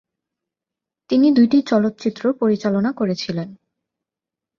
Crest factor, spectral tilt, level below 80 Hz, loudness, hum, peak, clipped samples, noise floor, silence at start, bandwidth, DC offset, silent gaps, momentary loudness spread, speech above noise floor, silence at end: 16 dB; -7 dB/octave; -62 dBFS; -18 LUFS; none; -4 dBFS; under 0.1%; -87 dBFS; 1.1 s; 7.2 kHz; under 0.1%; none; 11 LU; 70 dB; 1.05 s